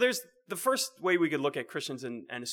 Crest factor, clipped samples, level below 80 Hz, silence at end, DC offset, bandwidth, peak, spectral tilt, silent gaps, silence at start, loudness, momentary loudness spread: 18 dB; under 0.1%; under -90 dBFS; 0 s; under 0.1%; over 20 kHz; -14 dBFS; -3 dB/octave; none; 0 s; -31 LUFS; 11 LU